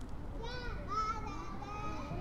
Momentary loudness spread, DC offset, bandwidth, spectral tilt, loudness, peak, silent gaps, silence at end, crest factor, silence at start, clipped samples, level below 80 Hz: 8 LU; under 0.1%; 12 kHz; -5.5 dB/octave; -41 LUFS; -26 dBFS; none; 0 s; 14 dB; 0 s; under 0.1%; -46 dBFS